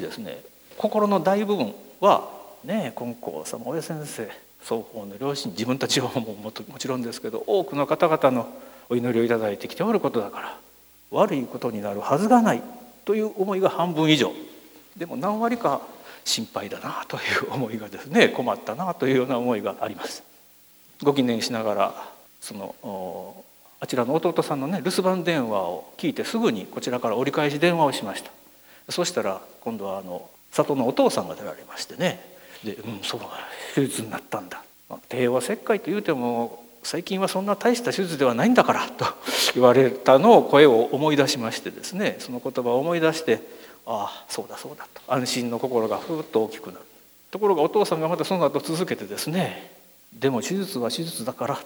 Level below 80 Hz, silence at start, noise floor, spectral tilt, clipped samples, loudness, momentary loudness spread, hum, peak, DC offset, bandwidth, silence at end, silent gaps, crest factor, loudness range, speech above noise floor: -70 dBFS; 0 s; -53 dBFS; -4.5 dB/octave; under 0.1%; -24 LUFS; 16 LU; none; 0 dBFS; under 0.1%; over 20 kHz; 0 s; none; 24 dB; 9 LU; 30 dB